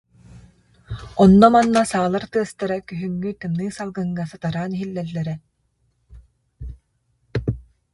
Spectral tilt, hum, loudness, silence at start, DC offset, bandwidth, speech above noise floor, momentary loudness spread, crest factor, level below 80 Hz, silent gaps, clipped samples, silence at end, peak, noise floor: -7 dB/octave; none; -20 LUFS; 0.35 s; under 0.1%; 11.5 kHz; 48 dB; 23 LU; 20 dB; -44 dBFS; none; under 0.1%; 0.3 s; 0 dBFS; -67 dBFS